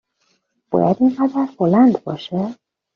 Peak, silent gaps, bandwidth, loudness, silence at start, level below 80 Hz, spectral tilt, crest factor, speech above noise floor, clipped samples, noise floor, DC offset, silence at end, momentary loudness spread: -2 dBFS; none; 6.2 kHz; -18 LUFS; 0.7 s; -60 dBFS; -7.5 dB/octave; 16 dB; 49 dB; under 0.1%; -66 dBFS; under 0.1%; 0.4 s; 11 LU